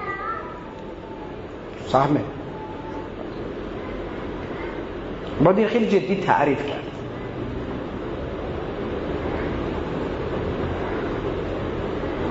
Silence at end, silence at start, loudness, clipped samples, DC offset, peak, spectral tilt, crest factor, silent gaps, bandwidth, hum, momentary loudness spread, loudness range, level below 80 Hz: 0 s; 0 s; -26 LUFS; under 0.1%; under 0.1%; -4 dBFS; -7.5 dB/octave; 22 dB; none; 7.8 kHz; none; 14 LU; 6 LU; -40 dBFS